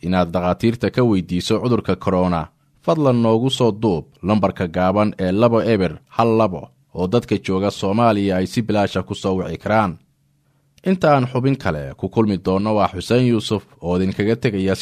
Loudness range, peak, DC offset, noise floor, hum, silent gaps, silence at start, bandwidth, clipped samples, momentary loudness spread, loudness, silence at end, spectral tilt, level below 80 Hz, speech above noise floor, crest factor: 2 LU; -2 dBFS; under 0.1%; -61 dBFS; none; none; 0.05 s; 14 kHz; under 0.1%; 7 LU; -19 LUFS; 0 s; -7 dB/octave; -46 dBFS; 43 dB; 16 dB